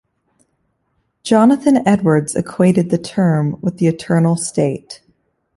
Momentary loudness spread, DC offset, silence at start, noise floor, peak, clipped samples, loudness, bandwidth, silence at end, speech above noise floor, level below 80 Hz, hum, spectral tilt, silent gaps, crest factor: 10 LU; under 0.1%; 1.25 s; -67 dBFS; -2 dBFS; under 0.1%; -15 LUFS; 11.5 kHz; 0.6 s; 52 dB; -54 dBFS; none; -6.5 dB/octave; none; 14 dB